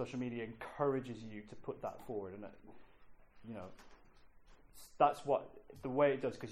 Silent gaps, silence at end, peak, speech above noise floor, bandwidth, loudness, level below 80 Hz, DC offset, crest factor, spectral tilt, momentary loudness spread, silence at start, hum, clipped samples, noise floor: none; 0 s; -18 dBFS; 22 dB; 15 kHz; -38 LUFS; -66 dBFS; under 0.1%; 22 dB; -6.5 dB/octave; 21 LU; 0 s; none; under 0.1%; -61 dBFS